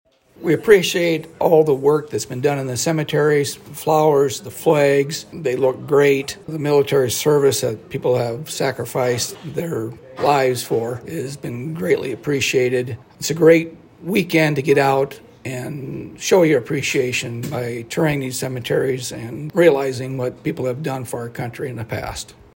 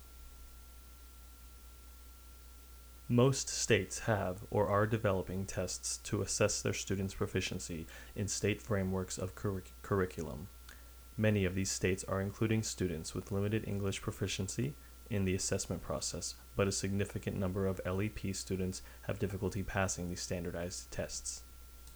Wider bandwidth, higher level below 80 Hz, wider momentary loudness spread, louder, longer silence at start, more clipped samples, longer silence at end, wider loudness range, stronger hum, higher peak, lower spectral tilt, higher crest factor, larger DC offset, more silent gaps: second, 16.5 kHz vs over 20 kHz; about the same, -54 dBFS vs -54 dBFS; second, 13 LU vs 23 LU; first, -19 LUFS vs -36 LUFS; first, 0.4 s vs 0 s; neither; first, 0.25 s vs 0 s; about the same, 4 LU vs 4 LU; neither; first, 0 dBFS vs -14 dBFS; about the same, -5 dB/octave vs -4.5 dB/octave; about the same, 18 dB vs 22 dB; neither; neither